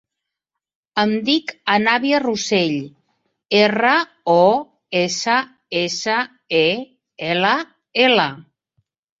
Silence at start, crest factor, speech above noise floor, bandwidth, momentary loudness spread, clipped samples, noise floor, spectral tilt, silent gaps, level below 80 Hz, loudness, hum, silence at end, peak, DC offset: 0.95 s; 18 dB; 65 dB; 8 kHz; 10 LU; under 0.1%; -83 dBFS; -4 dB/octave; none; -64 dBFS; -18 LUFS; none; 0.8 s; -2 dBFS; under 0.1%